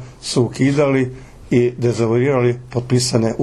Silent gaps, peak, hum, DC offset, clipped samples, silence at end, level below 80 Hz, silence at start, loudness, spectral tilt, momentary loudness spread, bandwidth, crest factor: none; -2 dBFS; none; under 0.1%; under 0.1%; 0 s; -46 dBFS; 0 s; -17 LUFS; -6 dB/octave; 4 LU; 12.5 kHz; 16 dB